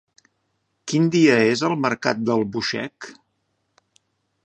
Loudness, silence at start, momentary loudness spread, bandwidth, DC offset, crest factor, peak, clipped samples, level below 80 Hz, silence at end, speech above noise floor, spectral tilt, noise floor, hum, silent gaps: -20 LUFS; 0.85 s; 20 LU; 9 kHz; under 0.1%; 22 dB; -2 dBFS; under 0.1%; -66 dBFS; 1.35 s; 52 dB; -5.5 dB/octave; -72 dBFS; none; none